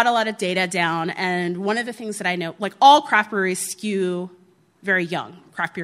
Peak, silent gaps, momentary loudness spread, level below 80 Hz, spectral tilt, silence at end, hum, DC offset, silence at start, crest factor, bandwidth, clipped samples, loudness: 0 dBFS; none; 14 LU; -72 dBFS; -3.5 dB/octave; 0 s; none; under 0.1%; 0 s; 22 dB; 15 kHz; under 0.1%; -21 LUFS